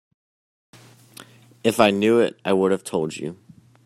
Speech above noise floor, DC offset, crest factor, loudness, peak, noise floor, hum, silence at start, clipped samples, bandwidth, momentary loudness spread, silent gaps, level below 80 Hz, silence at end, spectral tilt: 27 dB; under 0.1%; 22 dB; -20 LUFS; -2 dBFS; -47 dBFS; none; 1.2 s; under 0.1%; 15 kHz; 12 LU; none; -64 dBFS; 0.5 s; -5 dB/octave